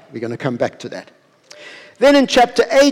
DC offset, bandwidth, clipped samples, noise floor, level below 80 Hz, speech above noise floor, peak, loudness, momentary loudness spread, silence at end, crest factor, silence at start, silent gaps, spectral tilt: under 0.1%; 16 kHz; under 0.1%; -42 dBFS; -50 dBFS; 27 dB; -6 dBFS; -15 LUFS; 24 LU; 0 s; 12 dB; 0.15 s; none; -4 dB/octave